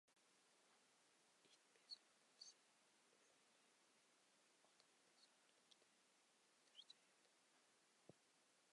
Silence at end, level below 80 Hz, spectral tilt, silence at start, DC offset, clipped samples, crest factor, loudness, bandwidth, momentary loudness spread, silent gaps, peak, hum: 0 s; under -90 dBFS; -1 dB/octave; 0.05 s; under 0.1%; under 0.1%; 26 dB; -64 LUFS; 11 kHz; 7 LU; none; -48 dBFS; none